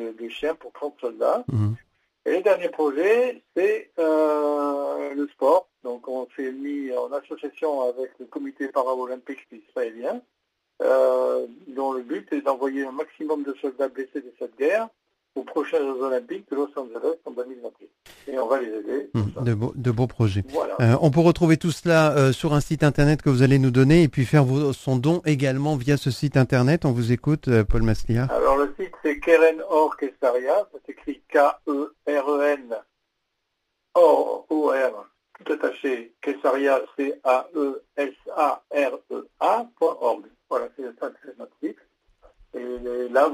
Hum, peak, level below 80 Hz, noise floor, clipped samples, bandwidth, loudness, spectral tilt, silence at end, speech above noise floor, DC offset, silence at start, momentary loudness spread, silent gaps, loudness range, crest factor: none; -4 dBFS; -44 dBFS; -77 dBFS; under 0.1%; 15.5 kHz; -23 LUFS; -7.5 dB/octave; 0 s; 54 dB; under 0.1%; 0 s; 16 LU; none; 9 LU; 20 dB